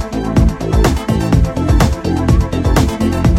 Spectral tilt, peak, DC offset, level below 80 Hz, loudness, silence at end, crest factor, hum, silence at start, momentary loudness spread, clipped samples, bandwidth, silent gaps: -6.5 dB/octave; 0 dBFS; under 0.1%; -18 dBFS; -14 LUFS; 0 s; 12 dB; none; 0 s; 2 LU; under 0.1%; 16.5 kHz; none